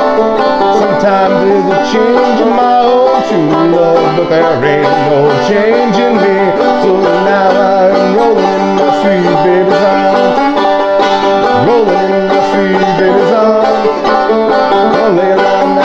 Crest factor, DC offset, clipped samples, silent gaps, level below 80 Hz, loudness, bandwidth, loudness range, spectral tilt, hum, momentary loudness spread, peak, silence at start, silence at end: 8 dB; under 0.1%; under 0.1%; none; -42 dBFS; -9 LUFS; 8 kHz; 0 LU; -6 dB/octave; none; 2 LU; 0 dBFS; 0 s; 0 s